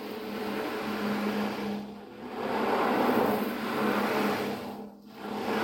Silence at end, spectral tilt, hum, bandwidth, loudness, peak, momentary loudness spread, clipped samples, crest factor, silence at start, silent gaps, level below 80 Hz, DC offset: 0 s; -5.5 dB/octave; none; 17 kHz; -30 LUFS; -12 dBFS; 15 LU; under 0.1%; 18 dB; 0 s; none; -64 dBFS; under 0.1%